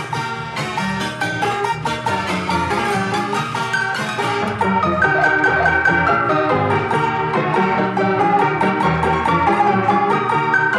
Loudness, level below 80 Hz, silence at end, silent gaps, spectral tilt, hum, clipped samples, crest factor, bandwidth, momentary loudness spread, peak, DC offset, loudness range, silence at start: -17 LUFS; -48 dBFS; 0 s; none; -5.5 dB/octave; none; under 0.1%; 14 dB; 13.5 kHz; 7 LU; -2 dBFS; under 0.1%; 4 LU; 0 s